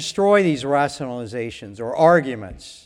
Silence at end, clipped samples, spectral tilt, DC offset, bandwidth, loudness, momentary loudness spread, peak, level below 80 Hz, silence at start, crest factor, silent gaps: 0.1 s; under 0.1%; -5.5 dB/octave; under 0.1%; 12 kHz; -19 LUFS; 16 LU; -2 dBFS; -52 dBFS; 0 s; 18 dB; none